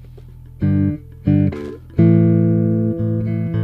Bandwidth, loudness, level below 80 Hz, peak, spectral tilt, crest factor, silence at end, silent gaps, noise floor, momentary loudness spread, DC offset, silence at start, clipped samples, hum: 4.2 kHz; -17 LUFS; -40 dBFS; -2 dBFS; -12 dB/octave; 16 dB; 0 s; none; -38 dBFS; 10 LU; under 0.1%; 0 s; under 0.1%; none